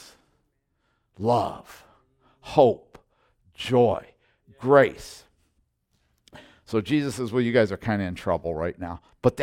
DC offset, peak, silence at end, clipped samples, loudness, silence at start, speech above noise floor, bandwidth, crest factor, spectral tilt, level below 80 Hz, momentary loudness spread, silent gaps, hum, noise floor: under 0.1%; -4 dBFS; 0 s; under 0.1%; -24 LUFS; 1.2 s; 49 dB; 15.5 kHz; 22 dB; -6.5 dB/octave; -56 dBFS; 16 LU; none; none; -72 dBFS